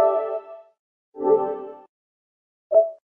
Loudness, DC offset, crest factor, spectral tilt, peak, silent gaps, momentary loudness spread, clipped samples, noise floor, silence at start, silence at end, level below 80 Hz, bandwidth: -23 LUFS; under 0.1%; 18 dB; -9.5 dB/octave; -6 dBFS; 0.79-1.12 s, 1.89-2.70 s; 17 LU; under 0.1%; under -90 dBFS; 0 s; 0.2 s; -76 dBFS; 3.5 kHz